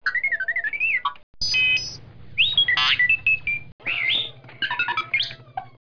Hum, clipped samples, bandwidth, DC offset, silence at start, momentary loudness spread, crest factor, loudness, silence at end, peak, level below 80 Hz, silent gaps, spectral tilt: none; under 0.1%; 5.4 kHz; 0.6%; 0.05 s; 14 LU; 14 dB; -21 LUFS; 0.15 s; -10 dBFS; -52 dBFS; 1.23-1.34 s, 3.72-3.79 s; -0.5 dB/octave